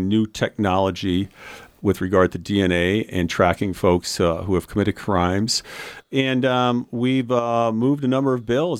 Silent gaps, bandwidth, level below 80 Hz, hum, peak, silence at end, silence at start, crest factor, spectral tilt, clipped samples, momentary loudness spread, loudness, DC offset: none; 16 kHz; -46 dBFS; none; -2 dBFS; 0 s; 0 s; 18 dB; -5.5 dB/octave; under 0.1%; 5 LU; -21 LUFS; under 0.1%